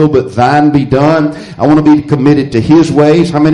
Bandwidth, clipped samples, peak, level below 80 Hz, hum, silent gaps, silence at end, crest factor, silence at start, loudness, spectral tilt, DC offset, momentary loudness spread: 10.5 kHz; under 0.1%; 0 dBFS; -36 dBFS; none; none; 0 s; 8 dB; 0 s; -8 LUFS; -7.5 dB/octave; under 0.1%; 4 LU